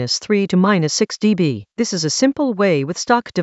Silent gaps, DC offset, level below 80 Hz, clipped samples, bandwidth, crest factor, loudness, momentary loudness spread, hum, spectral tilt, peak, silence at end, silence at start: none; under 0.1%; -60 dBFS; under 0.1%; 8.2 kHz; 16 dB; -17 LUFS; 5 LU; none; -4.5 dB/octave; 0 dBFS; 0 s; 0 s